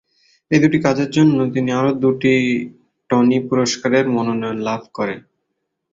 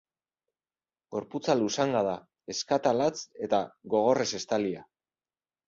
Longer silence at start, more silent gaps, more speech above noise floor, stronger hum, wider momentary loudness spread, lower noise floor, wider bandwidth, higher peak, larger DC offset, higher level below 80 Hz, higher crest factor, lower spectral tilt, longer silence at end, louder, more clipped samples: second, 0.5 s vs 1.1 s; neither; second, 58 dB vs over 62 dB; neither; second, 9 LU vs 12 LU; second, -74 dBFS vs under -90 dBFS; about the same, 7.8 kHz vs 7.8 kHz; first, -2 dBFS vs -10 dBFS; neither; first, -56 dBFS vs -70 dBFS; about the same, 16 dB vs 20 dB; first, -6 dB/octave vs -4.5 dB/octave; about the same, 0.75 s vs 0.85 s; first, -17 LUFS vs -29 LUFS; neither